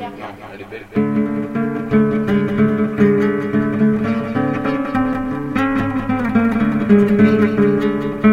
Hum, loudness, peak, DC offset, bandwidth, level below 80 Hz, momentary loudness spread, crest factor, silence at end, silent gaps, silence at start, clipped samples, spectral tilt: none; -17 LUFS; 0 dBFS; under 0.1%; 6.4 kHz; -42 dBFS; 8 LU; 16 dB; 0 s; none; 0 s; under 0.1%; -9 dB/octave